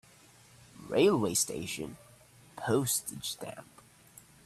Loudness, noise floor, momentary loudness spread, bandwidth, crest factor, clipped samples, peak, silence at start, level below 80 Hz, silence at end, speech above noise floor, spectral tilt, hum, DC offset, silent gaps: -31 LUFS; -59 dBFS; 20 LU; 15.5 kHz; 20 dB; under 0.1%; -14 dBFS; 0.75 s; -66 dBFS; 0.8 s; 28 dB; -3.5 dB/octave; none; under 0.1%; none